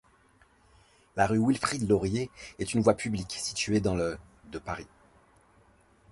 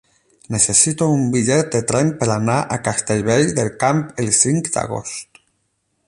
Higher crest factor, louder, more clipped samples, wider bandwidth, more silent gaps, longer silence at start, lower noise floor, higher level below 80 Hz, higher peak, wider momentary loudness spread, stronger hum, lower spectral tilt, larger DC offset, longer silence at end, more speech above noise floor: about the same, 22 dB vs 18 dB; second, -29 LUFS vs -17 LUFS; neither; about the same, 11.5 kHz vs 11.5 kHz; neither; first, 1.15 s vs 0.5 s; second, -63 dBFS vs -68 dBFS; about the same, -52 dBFS vs -50 dBFS; second, -8 dBFS vs -2 dBFS; first, 14 LU vs 9 LU; neither; about the same, -5 dB/octave vs -4.5 dB/octave; neither; first, 1.25 s vs 0.85 s; second, 34 dB vs 51 dB